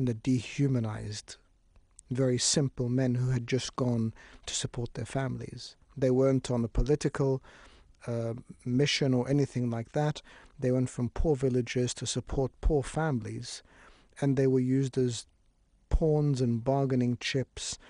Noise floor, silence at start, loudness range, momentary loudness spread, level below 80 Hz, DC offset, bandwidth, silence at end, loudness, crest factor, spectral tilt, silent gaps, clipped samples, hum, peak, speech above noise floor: -66 dBFS; 0 s; 2 LU; 12 LU; -42 dBFS; under 0.1%; 10.5 kHz; 0.15 s; -30 LUFS; 18 dB; -5.5 dB/octave; none; under 0.1%; none; -12 dBFS; 37 dB